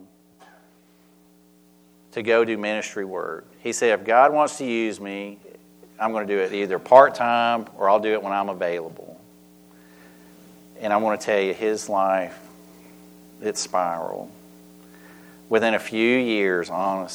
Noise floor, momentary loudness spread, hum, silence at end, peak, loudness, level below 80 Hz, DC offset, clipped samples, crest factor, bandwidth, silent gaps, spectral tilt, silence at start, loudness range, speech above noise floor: -56 dBFS; 16 LU; none; 0 s; 0 dBFS; -22 LUFS; -70 dBFS; under 0.1%; under 0.1%; 24 dB; over 20 kHz; none; -4 dB/octave; 0 s; 8 LU; 34 dB